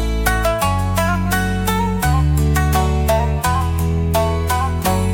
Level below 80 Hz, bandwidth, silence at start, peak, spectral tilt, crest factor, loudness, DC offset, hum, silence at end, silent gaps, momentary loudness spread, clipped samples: -22 dBFS; 17 kHz; 0 s; -4 dBFS; -5.5 dB/octave; 14 dB; -17 LUFS; under 0.1%; none; 0 s; none; 2 LU; under 0.1%